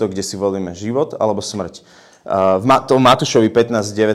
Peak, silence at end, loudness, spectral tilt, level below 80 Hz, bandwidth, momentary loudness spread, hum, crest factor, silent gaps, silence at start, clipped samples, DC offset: -2 dBFS; 0 s; -16 LUFS; -5 dB/octave; -52 dBFS; 15.5 kHz; 11 LU; none; 14 dB; none; 0 s; under 0.1%; under 0.1%